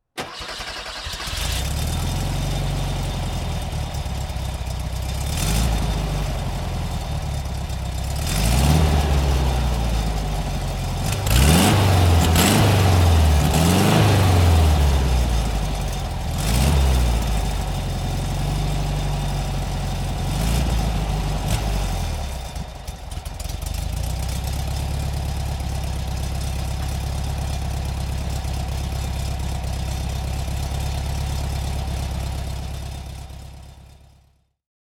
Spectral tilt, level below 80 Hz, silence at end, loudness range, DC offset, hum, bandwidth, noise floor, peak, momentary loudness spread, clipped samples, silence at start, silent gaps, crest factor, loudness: -5 dB/octave; -24 dBFS; 0.95 s; 11 LU; under 0.1%; none; 18 kHz; -59 dBFS; -2 dBFS; 13 LU; under 0.1%; 0.15 s; none; 20 dB; -22 LUFS